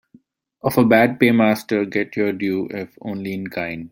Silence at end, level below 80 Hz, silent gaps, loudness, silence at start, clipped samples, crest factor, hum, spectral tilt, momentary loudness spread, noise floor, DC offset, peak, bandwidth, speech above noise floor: 0.05 s; -58 dBFS; none; -19 LUFS; 0.65 s; under 0.1%; 18 dB; none; -6.5 dB/octave; 14 LU; -54 dBFS; under 0.1%; -2 dBFS; 16.5 kHz; 35 dB